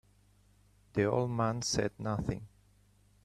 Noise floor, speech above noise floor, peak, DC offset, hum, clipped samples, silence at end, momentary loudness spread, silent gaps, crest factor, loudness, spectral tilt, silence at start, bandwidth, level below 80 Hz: -66 dBFS; 33 dB; -16 dBFS; under 0.1%; 50 Hz at -55 dBFS; under 0.1%; 0.75 s; 8 LU; none; 20 dB; -33 LUFS; -5 dB/octave; 0.95 s; 13 kHz; -56 dBFS